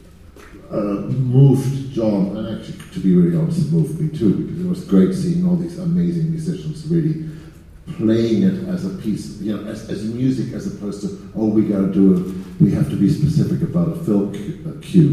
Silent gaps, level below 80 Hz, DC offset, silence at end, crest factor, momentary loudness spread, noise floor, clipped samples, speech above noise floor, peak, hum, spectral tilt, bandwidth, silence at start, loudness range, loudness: none; -44 dBFS; under 0.1%; 0 s; 18 dB; 12 LU; -42 dBFS; under 0.1%; 24 dB; 0 dBFS; none; -9 dB/octave; 12.5 kHz; 0.35 s; 4 LU; -19 LUFS